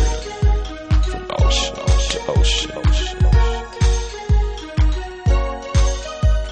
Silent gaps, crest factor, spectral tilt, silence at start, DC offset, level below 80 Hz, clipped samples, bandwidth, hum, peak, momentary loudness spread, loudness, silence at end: none; 14 dB; -4.5 dB/octave; 0 s; under 0.1%; -18 dBFS; under 0.1%; 9 kHz; none; -2 dBFS; 5 LU; -20 LUFS; 0 s